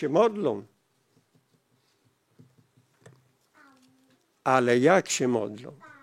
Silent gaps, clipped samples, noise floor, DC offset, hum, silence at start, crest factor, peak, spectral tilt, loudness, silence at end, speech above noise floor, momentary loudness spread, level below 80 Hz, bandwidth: none; under 0.1%; -69 dBFS; under 0.1%; none; 0 s; 22 dB; -6 dBFS; -4.5 dB/octave; -25 LUFS; 0.3 s; 45 dB; 17 LU; -84 dBFS; 15.5 kHz